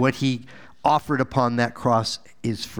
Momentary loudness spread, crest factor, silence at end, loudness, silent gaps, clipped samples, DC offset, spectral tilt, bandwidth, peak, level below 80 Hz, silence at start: 8 LU; 18 dB; 0 s; -23 LUFS; none; under 0.1%; 0.5%; -5.5 dB/octave; over 20 kHz; -4 dBFS; -54 dBFS; 0 s